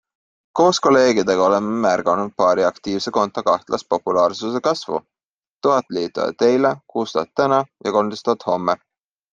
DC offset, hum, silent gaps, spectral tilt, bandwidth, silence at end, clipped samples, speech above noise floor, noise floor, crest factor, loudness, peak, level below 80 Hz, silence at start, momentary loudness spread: under 0.1%; none; 5.25-5.41 s, 5.51-5.57 s; -4.5 dB/octave; 7.6 kHz; 0.55 s; under 0.1%; over 72 dB; under -90 dBFS; 16 dB; -19 LUFS; -2 dBFS; -62 dBFS; 0.55 s; 8 LU